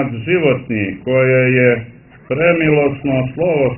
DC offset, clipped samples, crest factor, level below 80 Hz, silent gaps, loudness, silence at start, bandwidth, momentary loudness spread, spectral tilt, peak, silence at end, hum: under 0.1%; under 0.1%; 14 dB; -46 dBFS; none; -15 LUFS; 0 s; 3.2 kHz; 8 LU; -12 dB/octave; 0 dBFS; 0 s; none